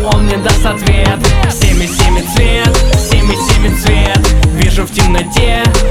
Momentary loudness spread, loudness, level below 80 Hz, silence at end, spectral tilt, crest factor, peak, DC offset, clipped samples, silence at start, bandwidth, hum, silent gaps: 2 LU; -11 LUFS; -12 dBFS; 0 s; -4.5 dB/octave; 8 dB; 0 dBFS; under 0.1%; under 0.1%; 0 s; 16 kHz; none; none